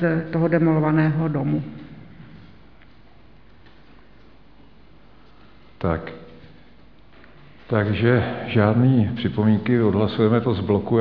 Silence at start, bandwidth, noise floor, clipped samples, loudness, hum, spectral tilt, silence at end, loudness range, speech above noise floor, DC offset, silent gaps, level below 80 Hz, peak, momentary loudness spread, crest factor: 0 s; 5.4 kHz; -51 dBFS; under 0.1%; -20 LUFS; none; -11 dB/octave; 0 s; 15 LU; 32 dB; 0.4%; none; -50 dBFS; -2 dBFS; 11 LU; 20 dB